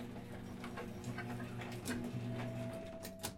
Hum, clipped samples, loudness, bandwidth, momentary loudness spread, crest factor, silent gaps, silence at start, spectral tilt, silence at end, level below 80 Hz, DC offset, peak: none; under 0.1%; -45 LUFS; 16.5 kHz; 6 LU; 18 dB; none; 0 s; -5.5 dB/octave; 0 s; -62 dBFS; under 0.1%; -26 dBFS